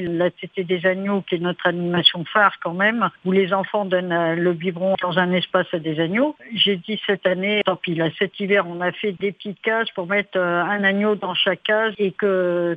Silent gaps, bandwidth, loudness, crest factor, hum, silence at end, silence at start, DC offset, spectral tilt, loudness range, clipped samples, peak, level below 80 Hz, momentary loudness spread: none; 5 kHz; -20 LUFS; 20 dB; none; 0 s; 0 s; under 0.1%; -7.5 dB/octave; 2 LU; under 0.1%; 0 dBFS; -68 dBFS; 6 LU